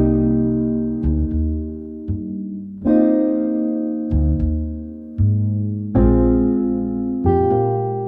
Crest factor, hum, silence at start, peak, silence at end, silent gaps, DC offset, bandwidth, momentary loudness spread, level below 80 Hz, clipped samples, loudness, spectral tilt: 14 dB; none; 0 s; -4 dBFS; 0 s; none; under 0.1%; 3.3 kHz; 12 LU; -28 dBFS; under 0.1%; -19 LUFS; -14 dB/octave